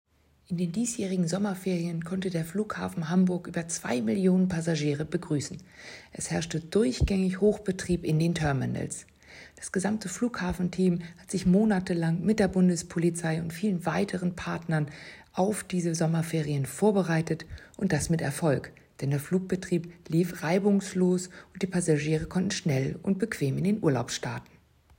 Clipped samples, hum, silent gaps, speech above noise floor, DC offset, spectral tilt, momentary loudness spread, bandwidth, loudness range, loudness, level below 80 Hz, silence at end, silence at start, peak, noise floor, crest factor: under 0.1%; none; none; 23 dB; under 0.1%; -6 dB/octave; 9 LU; 16 kHz; 3 LU; -28 LUFS; -48 dBFS; 0.55 s; 0.5 s; -10 dBFS; -51 dBFS; 18 dB